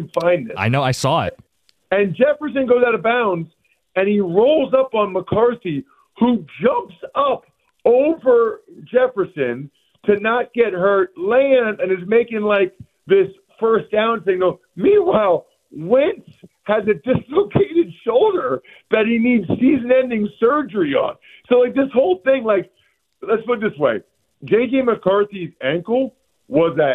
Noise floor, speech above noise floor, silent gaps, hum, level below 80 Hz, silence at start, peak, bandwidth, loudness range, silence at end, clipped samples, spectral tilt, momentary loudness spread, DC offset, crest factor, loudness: -62 dBFS; 45 dB; none; none; -56 dBFS; 0 s; -2 dBFS; 11.5 kHz; 2 LU; 0 s; under 0.1%; -6.5 dB/octave; 9 LU; under 0.1%; 16 dB; -18 LUFS